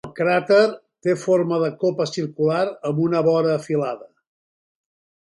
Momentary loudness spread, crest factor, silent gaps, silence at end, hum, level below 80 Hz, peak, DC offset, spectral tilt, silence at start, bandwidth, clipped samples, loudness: 8 LU; 18 dB; none; 1.3 s; none; -68 dBFS; -4 dBFS; under 0.1%; -6.5 dB/octave; 0.05 s; 11.5 kHz; under 0.1%; -21 LUFS